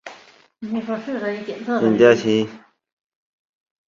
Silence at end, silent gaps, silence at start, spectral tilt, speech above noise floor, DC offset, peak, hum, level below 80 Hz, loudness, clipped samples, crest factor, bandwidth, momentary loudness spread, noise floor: 1.3 s; none; 0.05 s; -6 dB/octave; 30 dB; under 0.1%; -2 dBFS; none; -64 dBFS; -20 LUFS; under 0.1%; 20 dB; 7.4 kHz; 16 LU; -49 dBFS